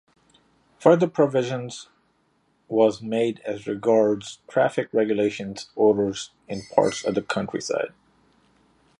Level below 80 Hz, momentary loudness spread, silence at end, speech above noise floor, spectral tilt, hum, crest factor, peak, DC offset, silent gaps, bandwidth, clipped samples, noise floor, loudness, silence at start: -64 dBFS; 14 LU; 1.1 s; 44 dB; -5.5 dB/octave; none; 22 dB; -2 dBFS; under 0.1%; none; 11 kHz; under 0.1%; -66 dBFS; -23 LUFS; 0.8 s